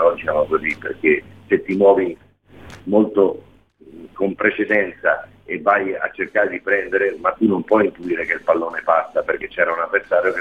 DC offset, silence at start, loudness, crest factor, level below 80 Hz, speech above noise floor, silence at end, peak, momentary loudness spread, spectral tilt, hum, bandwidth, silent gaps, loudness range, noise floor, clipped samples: 0.1%; 0 s; -19 LUFS; 18 dB; -56 dBFS; 28 dB; 0 s; -2 dBFS; 8 LU; -7.5 dB/octave; none; 7.2 kHz; none; 2 LU; -46 dBFS; under 0.1%